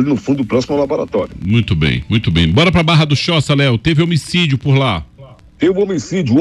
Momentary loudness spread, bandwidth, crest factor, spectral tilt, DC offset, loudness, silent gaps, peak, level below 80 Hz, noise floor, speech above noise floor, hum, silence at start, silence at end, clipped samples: 6 LU; 11.5 kHz; 12 dB; -6 dB/octave; under 0.1%; -14 LUFS; none; -2 dBFS; -34 dBFS; -39 dBFS; 26 dB; none; 0 s; 0 s; under 0.1%